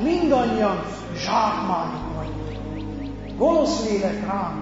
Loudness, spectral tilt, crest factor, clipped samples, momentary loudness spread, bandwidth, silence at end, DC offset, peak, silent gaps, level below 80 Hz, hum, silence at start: -23 LUFS; -6 dB/octave; 16 dB; under 0.1%; 12 LU; 8 kHz; 0 s; 0.1%; -6 dBFS; none; -40 dBFS; none; 0 s